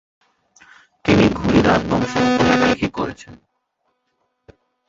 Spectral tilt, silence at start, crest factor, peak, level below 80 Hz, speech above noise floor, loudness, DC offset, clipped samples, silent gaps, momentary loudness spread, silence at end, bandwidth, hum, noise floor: -6 dB/octave; 1.05 s; 20 dB; 0 dBFS; -40 dBFS; 54 dB; -17 LUFS; under 0.1%; under 0.1%; none; 11 LU; 1.55 s; 7.8 kHz; none; -71 dBFS